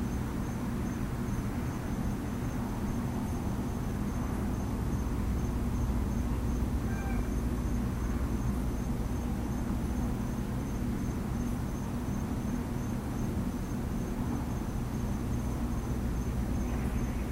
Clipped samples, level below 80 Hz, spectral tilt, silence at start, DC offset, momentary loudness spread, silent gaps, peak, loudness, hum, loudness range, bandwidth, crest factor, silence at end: under 0.1%; -36 dBFS; -7 dB/octave; 0 s; under 0.1%; 2 LU; none; -18 dBFS; -34 LUFS; none; 2 LU; 16 kHz; 14 dB; 0 s